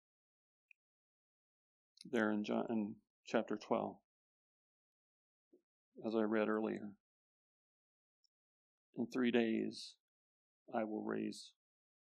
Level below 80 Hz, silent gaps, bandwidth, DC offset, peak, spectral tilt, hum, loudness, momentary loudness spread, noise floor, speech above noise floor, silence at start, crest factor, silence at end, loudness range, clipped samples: under -90 dBFS; 3.10-3.23 s, 4.04-5.51 s, 5.63-5.92 s, 7.00-8.93 s, 10.00-10.66 s; 10 kHz; under 0.1%; -20 dBFS; -6 dB/octave; none; -40 LUFS; 18 LU; under -90 dBFS; over 51 dB; 2.05 s; 24 dB; 0.7 s; 2 LU; under 0.1%